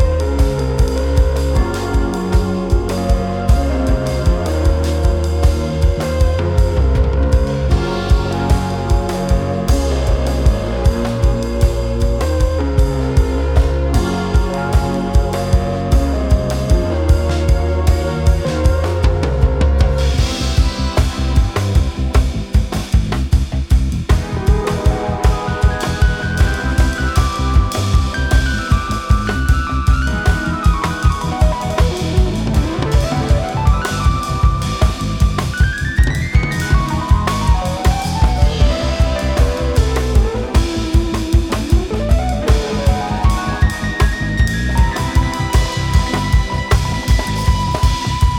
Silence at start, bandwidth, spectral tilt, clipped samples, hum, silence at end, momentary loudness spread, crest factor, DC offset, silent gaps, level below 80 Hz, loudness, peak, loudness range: 0 s; 14.5 kHz; -6 dB/octave; under 0.1%; none; 0 s; 2 LU; 14 dB; under 0.1%; none; -16 dBFS; -16 LUFS; 0 dBFS; 1 LU